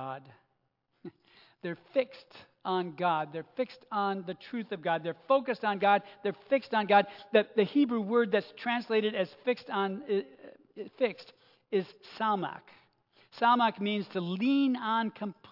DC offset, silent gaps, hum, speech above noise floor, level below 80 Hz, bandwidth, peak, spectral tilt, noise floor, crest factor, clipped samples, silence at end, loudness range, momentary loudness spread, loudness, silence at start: under 0.1%; none; none; 47 dB; -88 dBFS; 5.8 kHz; -10 dBFS; -7.5 dB/octave; -77 dBFS; 22 dB; under 0.1%; 0.2 s; 7 LU; 16 LU; -30 LUFS; 0 s